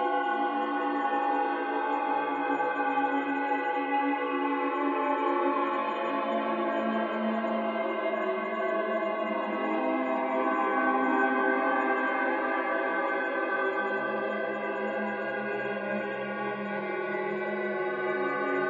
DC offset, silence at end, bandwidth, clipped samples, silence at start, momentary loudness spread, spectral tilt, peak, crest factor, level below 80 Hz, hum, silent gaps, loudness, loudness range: under 0.1%; 0 s; 7 kHz; under 0.1%; 0 s; 5 LU; -3 dB/octave; -14 dBFS; 14 dB; -86 dBFS; none; none; -29 LUFS; 4 LU